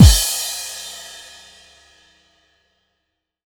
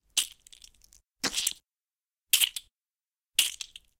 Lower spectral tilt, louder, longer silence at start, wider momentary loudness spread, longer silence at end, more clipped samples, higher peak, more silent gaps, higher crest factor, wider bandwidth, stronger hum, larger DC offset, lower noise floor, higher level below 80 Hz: first, -4 dB/octave vs 2 dB/octave; first, -18 LUFS vs -28 LUFS; second, 0 s vs 0.15 s; first, 24 LU vs 17 LU; first, 2.45 s vs 0.35 s; neither; first, 0 dBFS vs -6 dBFS; neither; second, 18 dB vs 28 dB; first, over 20 kHz vs 17 kHz; neither; neither; second, -76 dBFS vs under -90 dBFS; first, -24 dBFS vs -68 dBFS